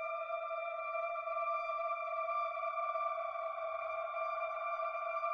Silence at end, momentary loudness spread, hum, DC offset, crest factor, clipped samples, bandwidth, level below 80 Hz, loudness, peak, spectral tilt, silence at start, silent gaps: 0 s; 3 LU; none; under 0.1%; 12 dB; under 0.1%; 6.2 kHz; -82 dBFS; -38 LUFS; -26 dBFS; -2 dB/octave; 0 s; none